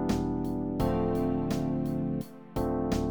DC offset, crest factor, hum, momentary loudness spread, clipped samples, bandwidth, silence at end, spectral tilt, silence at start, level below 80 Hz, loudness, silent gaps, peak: 0.2%; 16 dB; none; 5 LU; under 0.1%; over 20 kHz; 0 s; -7.5 dB/octave; 0 s; -42 dBFS; -31 LUFS; none; -14 dBFS